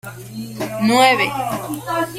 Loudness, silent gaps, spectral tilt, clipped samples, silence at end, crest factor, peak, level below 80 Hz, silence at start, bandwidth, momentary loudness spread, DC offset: -17 LUFS; none; -4 dB/octave; under 0.1%; 0 s; 18 dB; 0 dBFS; -54 dBFS; 0.05 s; 16.5 kHz; 18 LU; under 0.1%